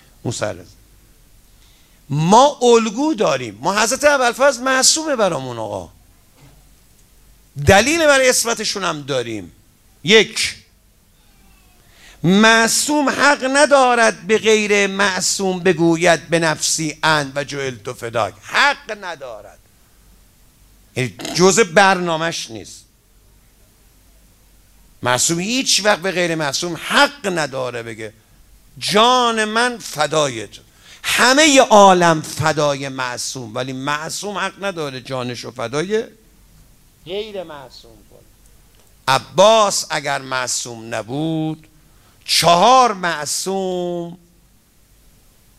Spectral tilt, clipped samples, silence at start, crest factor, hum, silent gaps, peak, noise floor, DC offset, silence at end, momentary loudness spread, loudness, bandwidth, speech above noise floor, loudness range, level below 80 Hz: -3 dB/octave; under 0.1%; 0.25 s; 18 dB; none; none; 0 dBFS; -53 dBFS; under 0.1%; 1.45 s; 16 LU; -16 LUFS; 16 kHz; 37 dB; 9 LU; -50 dBFS